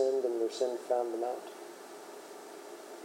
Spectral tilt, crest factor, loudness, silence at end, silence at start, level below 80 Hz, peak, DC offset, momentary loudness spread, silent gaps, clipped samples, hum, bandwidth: -3 dB/octave; 18 dB; -34 LUFS; 0 s; 0 s; under -90 dBFS; -18 dBFS; under 0.1%; 16 LU; none; under 0.1%; none; 16 kHz